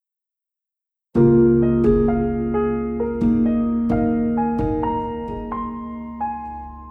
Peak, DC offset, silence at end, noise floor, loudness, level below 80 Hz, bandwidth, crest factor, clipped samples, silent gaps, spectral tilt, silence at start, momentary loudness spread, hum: -4 dBFS; under 0.1%; 0 s; -87 dBFS; -20 LUFS; -36 dBFS; 3.3 kHz; 16 dB; under 0.1%; none; -11 dB/octave; 1.15 s; 13 LU; none